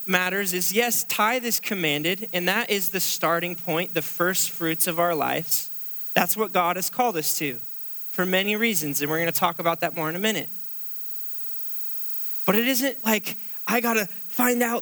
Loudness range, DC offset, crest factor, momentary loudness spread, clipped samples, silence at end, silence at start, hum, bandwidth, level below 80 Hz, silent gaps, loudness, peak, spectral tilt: 2 LU; under 0.1%; 22 dB; 7 LU; under 0.1%; 0 s; 0 s; none; over 20 kHz; -76 dBFS; none; -23 LUFS; -2 dBFS; -3 dB/octave